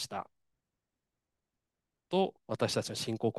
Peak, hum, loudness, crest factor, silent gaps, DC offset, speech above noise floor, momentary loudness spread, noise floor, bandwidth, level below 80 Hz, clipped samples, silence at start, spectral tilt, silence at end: -16 dBFS; none; -34 LUFS; 20 dB; none; under 0.1%; 55 dB; 9 LU; -88 dBFS; 12.5 kHz; -76 dBFS; under 0.1%; 0 s; -4.5 dB/octave; 0 s